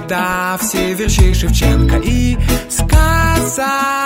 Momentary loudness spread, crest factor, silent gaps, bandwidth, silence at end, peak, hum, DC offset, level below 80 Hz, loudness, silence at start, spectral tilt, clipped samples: 4 LU; 12 dB; none; 16.5 kHz; 0 s; 0 dBFS; none; under 0.1%; -16 dBFS; -14 LUFS; 0 s; -4.5 dB/octave; under 0.1%